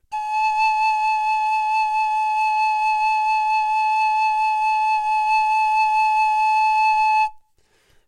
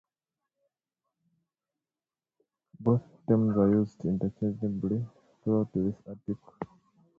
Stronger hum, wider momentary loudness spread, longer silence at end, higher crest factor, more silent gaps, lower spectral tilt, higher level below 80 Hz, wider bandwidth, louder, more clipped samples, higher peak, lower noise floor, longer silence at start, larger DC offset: neither; second, 3 LU vs 16 LU; first, 0.7 s vs 0.55 s; second, 8 dB vs 20 dB; neither; second, 3 dB/octave vs -11.5 dB/octave; about the same, -60 dBFS vs -60 dBFS; first, 11 kHz vs 4.6 kHz; first, -19 LUFS vs -29 LUFS; neither; about the same, -10 dBFS vs -12 dBFS; second, -61 dBFS vs under -90 dBFS; second, 0.1 s vs 2.8 s; neither